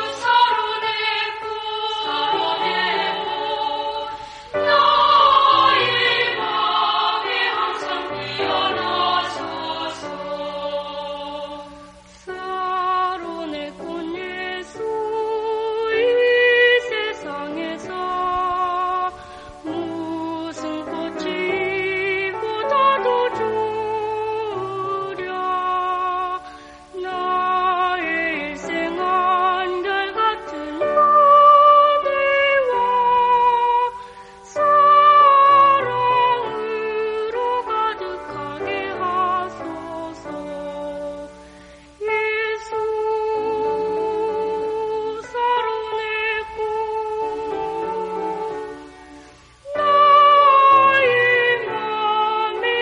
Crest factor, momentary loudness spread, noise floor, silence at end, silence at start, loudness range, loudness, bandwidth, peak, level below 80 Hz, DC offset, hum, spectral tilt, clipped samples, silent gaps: 16 dB; 17 LU; -45 dBFS; 0 s; 0 s; 11 LU; -19 LUFS; 10 kHz; -2 dBFS; -54 dBFS; under 0.1%; none; -4 dB/octave; under 0.1%; none